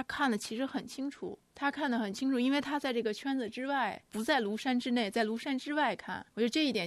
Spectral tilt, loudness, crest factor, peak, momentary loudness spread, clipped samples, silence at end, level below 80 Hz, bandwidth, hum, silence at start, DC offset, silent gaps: -4 dB/octave; -33 LUFS; 16 dB; -16 dBFS; 8 LU; under 0.1%; 0 s; -72 dBFS; 13.5 kHz; none; 0 s; under 0.1%; none